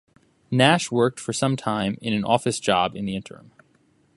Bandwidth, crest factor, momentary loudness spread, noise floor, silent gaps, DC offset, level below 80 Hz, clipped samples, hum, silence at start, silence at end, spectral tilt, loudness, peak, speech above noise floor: 11.5 kHz; 22 dB; 12 LU; -62 dBFS; none; under 0.1%; -58 dBFS; under 0.1%; none; 0.5 s; 0.9 s; -4.5 dB/octave; -22 LUFS; 0 dBFS; 39 dB